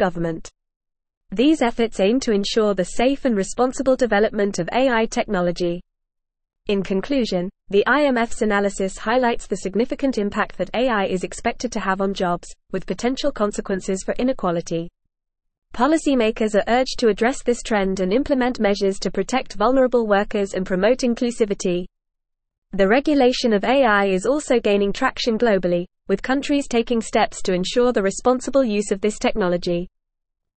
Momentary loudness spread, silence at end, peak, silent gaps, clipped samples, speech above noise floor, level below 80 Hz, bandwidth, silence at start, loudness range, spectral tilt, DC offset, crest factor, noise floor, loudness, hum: 8 LU; 0.7 s; -4 dBFS; 0.76-0.80 s, 1.17-1.21 s, 15.58-15.62 s, 22.58-22.62 s; under 0.1%; 59 dB; -42 dBFS; 8.8 kHz; 0 s; 4 LU; -5 dB/octave; 0.3%; 16 dB; -79 dBFS; -20 LUFS; none